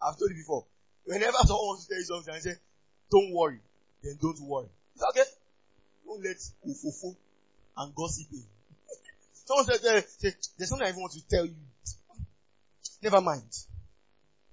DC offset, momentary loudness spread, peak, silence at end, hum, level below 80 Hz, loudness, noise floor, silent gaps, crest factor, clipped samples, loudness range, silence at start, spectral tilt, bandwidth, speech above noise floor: under 0.1%; 22 LU; -8 dBFS; 0.7 s; none; -44 dBFS; -30 LUFS; -73 dBFS; none; 22 dB; under 0.1%; 10 LU; 0 s; -4 dB/octave; 8 kHz; 44 dB